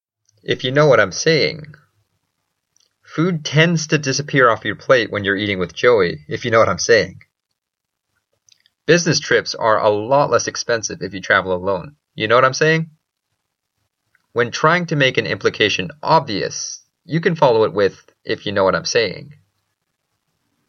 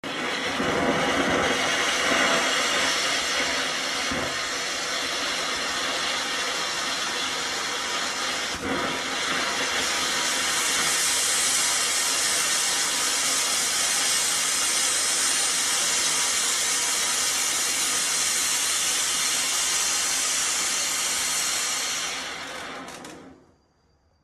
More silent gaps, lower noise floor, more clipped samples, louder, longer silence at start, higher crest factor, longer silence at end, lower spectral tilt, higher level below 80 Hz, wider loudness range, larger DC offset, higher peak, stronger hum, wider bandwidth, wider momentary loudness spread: neither; first, -80 dBFS vs -64 dBFS; neither; first, -17 LUFS vs -22 LUFS; first, 0.5 s vs 0.05 s; about the same, 18 dB vs 16 dB; first, 1.4 s vs 0.9 s; first, -4 dB/octave vs 0 dB/octave; about the same, -58 dBFS vs -56 dBFS; about the same, 3 LU vs 4 LU; neither; first, 0 dBFS vs -8 dBFS; neither; second, 7.4 kHz vs 13.5 kHz; first, 11 LU vs 6 LU